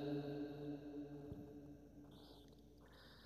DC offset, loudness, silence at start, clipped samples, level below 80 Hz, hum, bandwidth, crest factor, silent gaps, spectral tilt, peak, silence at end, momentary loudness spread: under 0.1%; -52 LUFS; 0 s; under 0.1%; -70 dBFS; none; 13.5 kHz; 16 dB; none; -8 dB/octave; -34 dBFS; 0 s; 17 LU